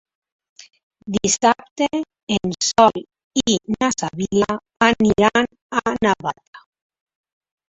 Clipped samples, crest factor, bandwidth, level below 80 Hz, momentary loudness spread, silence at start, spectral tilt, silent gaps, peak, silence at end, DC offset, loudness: under 0.1%; 20 dB; 8.4 kHz; -50 dBFS; 10 LU; 1.05 s; -3.5 dB/octave; 1.71-1.76 s, 2.23-2.27 s, 3.24-3.30 s, 5.62-5.70 s, 6.47-6.53 s; 0 dBFS; 1.15 s; under 0.1%; -19 LUFS